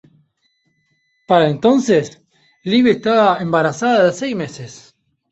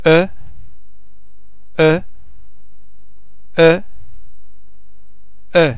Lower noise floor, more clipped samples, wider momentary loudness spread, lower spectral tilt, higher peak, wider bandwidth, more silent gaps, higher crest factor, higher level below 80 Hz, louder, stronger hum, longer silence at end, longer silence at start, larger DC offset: first, -65 dBFS vs -52 dBFS; neither; first, 16 LU vs 12 LU; second, -5.5 dB/octave vs -10 dB/octave; about the same, -2 dBFS vs 0 dBFS; first, 8.2 kHz vs 4 kHz; neither; about the same, 16 dB vs 18 dB; second, -58 dBFS vs -46 dBFS; about the same, -15 LUFS vs -15 LUFS; neither; first, 0.55 s vs 0 s; first, 1.3 s vs 0.05 s; second, under 0.1% vs 9%